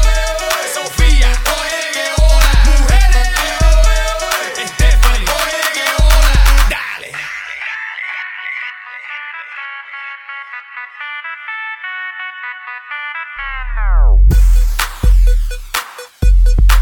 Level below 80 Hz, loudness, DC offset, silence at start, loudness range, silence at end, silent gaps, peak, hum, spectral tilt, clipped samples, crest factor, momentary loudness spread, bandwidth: -12 dBFS; -15 LUFS; under 0.1%; 0 s; 11 LU; 0 s; none; 0 dBFS; none; -3.5 dB/octave; under 0.1%; 12 dB; 14 LU; 18 kHz